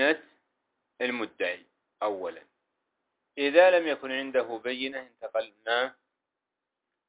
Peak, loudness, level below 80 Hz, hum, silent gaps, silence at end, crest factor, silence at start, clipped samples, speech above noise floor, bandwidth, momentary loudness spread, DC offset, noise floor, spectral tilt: -8 dBFS; -28 LUFS; -80 dBFS; none; none; 1.2 s; 22 dB; 0 s; under 0.1%; 59 dB; 4 kHz; 15 LU; under 0.1%; -87 dBFS; -6.5 dB/octave